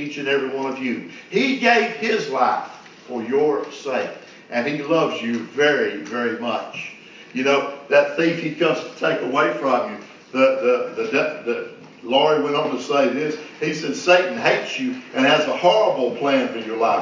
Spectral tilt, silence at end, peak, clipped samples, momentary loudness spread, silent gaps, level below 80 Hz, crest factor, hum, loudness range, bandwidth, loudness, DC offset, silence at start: -4.5 dB/octave; 0 s; -2 dBFS; under 0.1%; 11 LU; none; -78 dBFS; 20 dB; none; 4 LU; 7.6 kHz; -20 LUFS; under 0.1%; 0 s